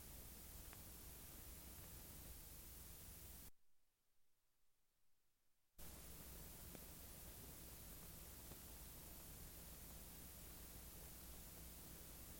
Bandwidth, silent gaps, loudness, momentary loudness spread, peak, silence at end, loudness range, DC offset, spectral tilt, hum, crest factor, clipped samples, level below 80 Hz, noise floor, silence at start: 17 kHz; none; -57 LUFS; 1 LU; -38 dBFS; 0 s; 6 LU; under 0.1%; -3 dB/octave; none; 20 dB; under 0.1%; -64 dBFS; -82 dBFS; 0 s